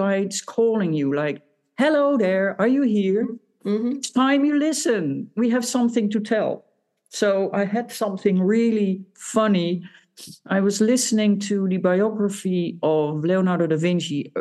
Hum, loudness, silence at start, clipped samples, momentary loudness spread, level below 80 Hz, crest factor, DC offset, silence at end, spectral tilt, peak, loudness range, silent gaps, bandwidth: none; -21 LUFS; 0 s; under 0.1%; 8 LU; -78 dBFS; 16 dB; under 0.1%; 0 s; -5.5 dB/octave; -6 dBFS; 2 LU; none; 12.5 kHz